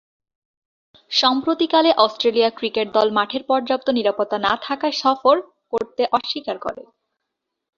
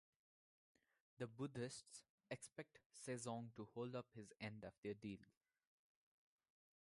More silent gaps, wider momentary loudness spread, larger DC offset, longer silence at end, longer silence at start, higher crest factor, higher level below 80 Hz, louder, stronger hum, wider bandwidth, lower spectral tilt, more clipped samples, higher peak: second, none vs 2.10-2.18 s, 2.86-2.90 s, 4.78-4.83 s; about the same, 9 LU vs 11 LU; neither; second, 0.95 s vs 1.55 s; about the same, 1.1 s vs 1.2 s; about the same, 20 dB vs 20 dB; first, -64 dBFS vs -84 dBFS; first, -19 LUFS vs -54 LUFS; neither; second, 7.4 kHz vs 11.5 kHz; second, -3.5 dB/octave vs -5 dB/octave; neither; first, -2 dBFS vs -34 dBFS